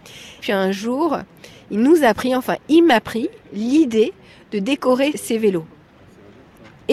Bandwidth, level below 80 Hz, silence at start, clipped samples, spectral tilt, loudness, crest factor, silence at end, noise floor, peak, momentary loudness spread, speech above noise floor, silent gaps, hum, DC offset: 13.5 kHz; -56 dBFS; 0.05 s; under 0.1%; -5 dB/octave; -18 LUFS; 16 dB; 0 s; -47 dBFS; -2 dBFS; 13 LU; 29 dB; none; none; under 0.1%